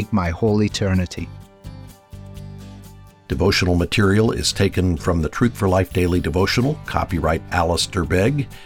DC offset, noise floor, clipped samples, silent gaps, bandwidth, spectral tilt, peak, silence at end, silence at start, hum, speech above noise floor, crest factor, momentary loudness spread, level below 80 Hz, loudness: under 0.1%; -42 dBFS; under 0.1%; none; 19.5 kHz; -5.5 dB/octave; -4 dBFS; 0 s; 0 s; none; 23 dB; 16 dB; 20 LU; -38 dBFS; -19 LUFS